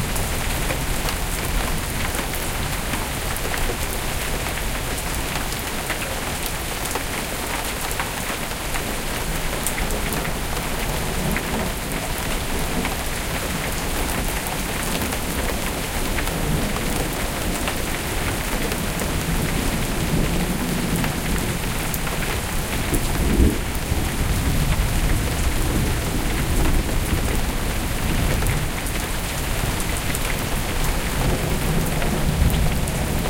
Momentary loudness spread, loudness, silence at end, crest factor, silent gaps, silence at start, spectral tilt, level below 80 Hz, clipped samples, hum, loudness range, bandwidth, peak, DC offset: 3 LU; -24 LUFS; 0 s; 20 dB; none; 0 s; -4 dB/octave; -26 dBFS; under 0.1%; none; 2 LU; 17 kHz; -4 dBFS; under 0.1%